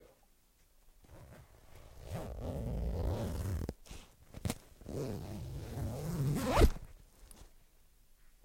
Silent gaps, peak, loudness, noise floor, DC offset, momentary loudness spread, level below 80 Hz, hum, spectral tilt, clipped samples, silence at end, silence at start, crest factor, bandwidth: none; -12 dBFS; -38 LUFS; -68 dBFS; under 0.1%; 26 LU; -42 dBFS; none; -6 dB/octave; under 0.1%; 0.95 s; 0 s; 26 dB; 16.5 kHz